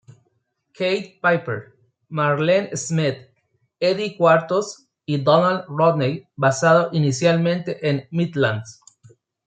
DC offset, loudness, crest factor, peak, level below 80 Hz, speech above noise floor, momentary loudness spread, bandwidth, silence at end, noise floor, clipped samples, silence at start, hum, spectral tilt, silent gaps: under 0.1%; -20 LUFS; 18 dB; -2 dBFS; -66 dBFS; 50 dB; 11 LU; 9.4 kHz; 0.75 s; -70 dBFS; under 0.1%; 0.8 s; none; -5.5 dB/octave; none